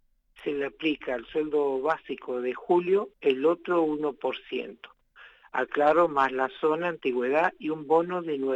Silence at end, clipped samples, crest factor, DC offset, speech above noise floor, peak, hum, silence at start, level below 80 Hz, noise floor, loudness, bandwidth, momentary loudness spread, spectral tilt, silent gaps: 0 s; under 0.1%; 18 dB; under 0.1%; 28 dB; -10 dBFS; none; 0.4 s; -66 dBFS; -54 dBFS; -27 LUFS; 8 kHz; 10 LU; -6.5 dB/octave; none